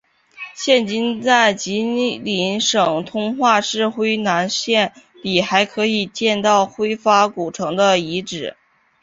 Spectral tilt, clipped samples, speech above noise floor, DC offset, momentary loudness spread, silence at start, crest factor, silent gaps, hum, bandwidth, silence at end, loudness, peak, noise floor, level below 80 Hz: -3.5 dB/octave; under 0.1%; 20 dB; under 0.1%; 9 LU; 0.4 s; 18 dB; none; none; 7.8 kHz; 0.5 s; -18 LUFS; 0 dBFS; -38 dBFS; -60 dBFS